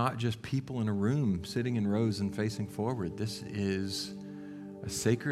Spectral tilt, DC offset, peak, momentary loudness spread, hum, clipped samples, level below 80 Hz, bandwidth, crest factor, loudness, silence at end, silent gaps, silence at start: -6 dB/octave; under 0.1%; -14 dBFS; 11 LU; 50 Hz at -50 dBFS; under 0.1%; -60 dBFS; 15 kHz; 18 dB; -33 LUFS; 0 s; none; 0 s